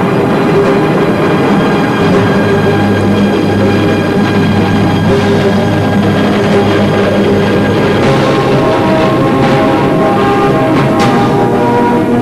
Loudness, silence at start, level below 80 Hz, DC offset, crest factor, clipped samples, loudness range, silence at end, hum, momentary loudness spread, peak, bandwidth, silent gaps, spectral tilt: -9 LUFS; 0 s; -34 dBFS; under 0.1%; 6 dB; under 0.1%; 1 LU; 0 s; none; 1 LU; -2 dBFS; 14 kHz; none; -7 dB/octave